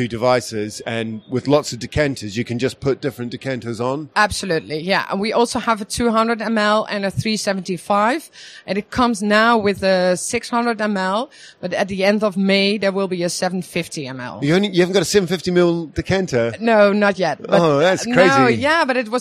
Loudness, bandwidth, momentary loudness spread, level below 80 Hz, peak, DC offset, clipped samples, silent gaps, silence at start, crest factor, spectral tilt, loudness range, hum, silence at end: -18 LUFS; 15 kHz; 11 LU; -48 dBFS; 0 dBFS; under 0.1%; under 0.1%; none; 0 s; 18 dB; -4.5 dB/octave; 5 LU; none; 0 s